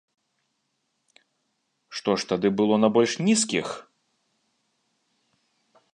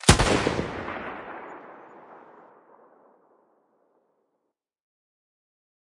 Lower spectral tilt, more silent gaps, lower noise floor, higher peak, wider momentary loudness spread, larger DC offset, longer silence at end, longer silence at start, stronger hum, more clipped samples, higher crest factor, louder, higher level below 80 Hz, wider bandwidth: about the same, -4 dB/octave vs -4 dB/octave; neither; second, -76 dBFS vs -80 dBFS; second, -6 dBFS vs 0 dBFS; second, 15 LU vs 28 LU; neither; second, 2.1 s vs 3.8 s; first, 1.9 s vs 0.05 s; neither; neither; second, 22 dB vs 30 dB; first, -23 LUFS vs -26 LUFS; second, -68 dBFS vs -40 dBFS; about the same, 10.5 kHz vs 11.5 kHz